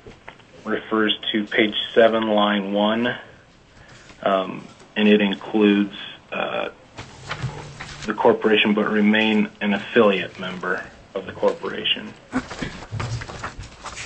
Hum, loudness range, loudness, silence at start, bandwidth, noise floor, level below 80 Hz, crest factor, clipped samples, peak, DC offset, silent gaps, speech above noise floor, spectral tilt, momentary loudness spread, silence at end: none; 5 LU; -21 LUFS; 0.05 s; 8.6 kHz; -49 dBFS; -50 dBFS; 20 dB; under 0.1%; -2 dBFS; under 0.1%; none; 29 dB; -5.5 dB/octave; 16 LU; 0 s